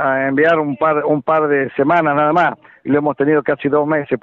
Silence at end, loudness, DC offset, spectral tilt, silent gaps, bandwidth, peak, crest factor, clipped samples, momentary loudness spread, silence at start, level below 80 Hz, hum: 0.05 s; -15 LUFS; under 0.1%; -8.5 dB/octave; none; 6 kHz; -4 dBFS; 12 dB; under 0.1%; 4 LU; 0 s; -56 dBFS; none